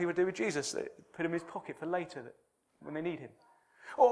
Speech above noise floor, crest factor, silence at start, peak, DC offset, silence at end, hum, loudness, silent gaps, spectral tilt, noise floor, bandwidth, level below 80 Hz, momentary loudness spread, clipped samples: 16 dB; 22 dB; 0 s; -14 dBFS; under 0.1%; 0 s; none; -36 LUFS; none; -4.5 dB/octave; -53 dBFS; 11 kHz; -80 dBFS; 19 LU; under 0.1%